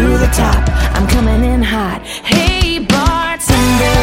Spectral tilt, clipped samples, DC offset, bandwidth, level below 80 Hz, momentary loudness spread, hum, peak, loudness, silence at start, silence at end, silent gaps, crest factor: -5 dB/octave; under 0.1%; under 0.1%; 16.5 kHz; -16 dBFS; 4 LU; none; 0 dBFS; -13 LUFS; 0 s; 0 s; none; 12 dB